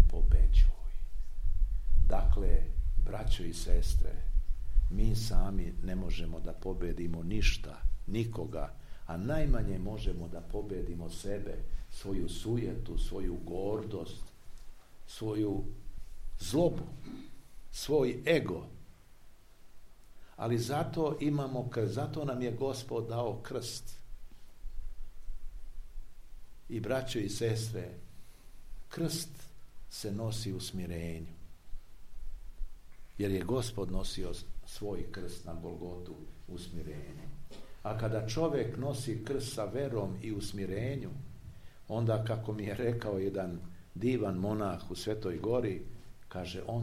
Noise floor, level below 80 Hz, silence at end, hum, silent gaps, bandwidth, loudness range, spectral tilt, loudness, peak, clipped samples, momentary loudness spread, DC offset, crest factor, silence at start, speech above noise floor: -53 dBFS; -34 dBFS; 0 s; none; none; 14 kHz; 7 LU; -6 dB/octave; -36 LUFS; -8 dBFS; under 0.1%; 19 LU; under 0.1%; 22 dB; 0 s; 21 dB